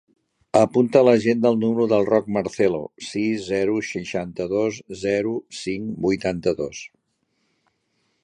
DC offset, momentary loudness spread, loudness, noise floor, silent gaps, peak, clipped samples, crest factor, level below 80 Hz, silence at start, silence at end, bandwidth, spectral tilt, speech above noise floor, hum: under 0.1%; 12 LU; -22 LUFS; -71 dBFS; none; -2 dBFS; under 0.1%; 20 dB; -56 dBFS; 0.55 s; 1.35 s; 10.5 kHz; -6 dB/octave; 50 dB; none